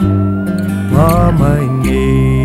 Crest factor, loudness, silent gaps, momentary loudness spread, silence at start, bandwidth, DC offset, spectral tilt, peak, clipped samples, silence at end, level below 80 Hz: 10 dB; -12 LUFS; none; 6 LU; 0 s; 15 kHz; under 0.1%; -8 dB/octave; 0 dBFS; under 0.1%; 0 s; -22 dBFS